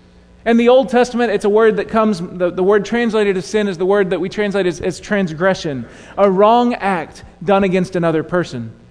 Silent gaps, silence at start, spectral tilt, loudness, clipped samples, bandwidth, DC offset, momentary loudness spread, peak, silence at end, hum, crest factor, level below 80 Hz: none; 0.45 s; -6 dB/octave; -16 LUFS; under 0.1%; 10.5 kHz; under 0.1%; 11 LU; 0 dBFS; 0.2 s; none; 16 dB; -46 dBFS